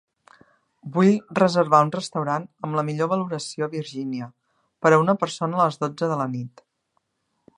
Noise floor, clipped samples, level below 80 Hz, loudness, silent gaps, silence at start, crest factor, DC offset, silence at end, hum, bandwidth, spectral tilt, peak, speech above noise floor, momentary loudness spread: -74 dBFS; under 0.1%; -72 dBFS; -23 LUFS; none; 0.85 s; 22 dB; under 0.1%; 1.1 s; none; 11 kHz; -6.5 dB/octave; -2 dBFS; 52 dB; 12 LU